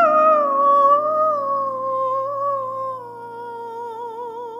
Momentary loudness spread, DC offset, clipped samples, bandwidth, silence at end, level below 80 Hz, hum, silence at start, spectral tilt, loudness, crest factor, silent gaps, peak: 17 LU; under 0.1%; under 0.1%; 7.2 kHz; 0 s; -78 dBFS; none; 0 s; -6.5 dB/octave; -18 LUFS; 14 dB; none; -4 dBFS